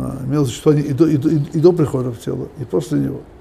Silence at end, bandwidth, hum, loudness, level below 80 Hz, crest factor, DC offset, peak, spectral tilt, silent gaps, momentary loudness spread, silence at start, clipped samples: 0.1 s; 14.5 kHz; none; -17 LUFS; -44 dBFS; 16 dB; under 0.1%; 0 dBFS; -8 dB/octave; none; 11 LU; 0 s; under 0.1%